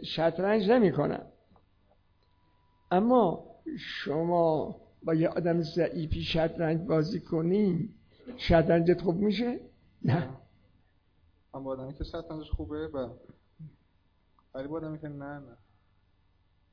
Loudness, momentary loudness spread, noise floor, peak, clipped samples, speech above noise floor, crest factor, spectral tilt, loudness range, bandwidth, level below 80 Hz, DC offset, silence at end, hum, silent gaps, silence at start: -29 LUFS; 16 LU; -68 dBFS; -12 dBFS; under 0.1%; 40 dB; 18 dB; -8.5 dB/octave; 12 LU; 5.4 kHz; -48 dBFS; under 0.1%; 1.2 s; none; none; 0 s